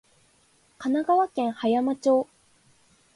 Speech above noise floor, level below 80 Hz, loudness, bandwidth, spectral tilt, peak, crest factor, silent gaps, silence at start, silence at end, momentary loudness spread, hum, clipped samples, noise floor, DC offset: 39 dB; -72 dBFS; -25 LUFS; 11.5 kHz; -5.5 dB/octave; -10 dBFS; 16 dB; none; 0.8 s; 0.95 s; 7 LU; none; under 0.1%; -63 dBFS; under 0.1%